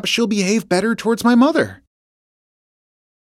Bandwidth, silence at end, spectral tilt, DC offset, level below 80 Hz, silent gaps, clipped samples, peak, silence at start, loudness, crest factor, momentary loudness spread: 14.5 kHz; 1.45 s; -4.5 dB/octave; under 0.1%; -58 dBFS; none; under 0.1%; -2 dBFS; 0.05 s; -17 LUFS; 16 dB; 6 LU